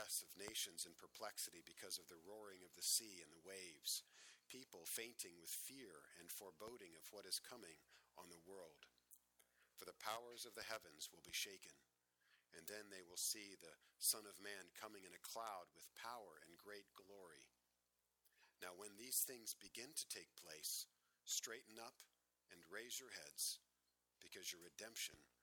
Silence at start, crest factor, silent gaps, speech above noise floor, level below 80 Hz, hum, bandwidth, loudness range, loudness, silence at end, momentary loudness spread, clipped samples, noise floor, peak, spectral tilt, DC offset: 0 s; 28 dB; none; 35 dB; under -90 dBFS; 60 Hz at -95 dBFS; over 20 kHz; 8 LU; -50 LUFS; 0.15 s; 19 LU; under 0.1%; -89 dBFS; -26 dBFS; 0.5 dB/octave; under 0.1%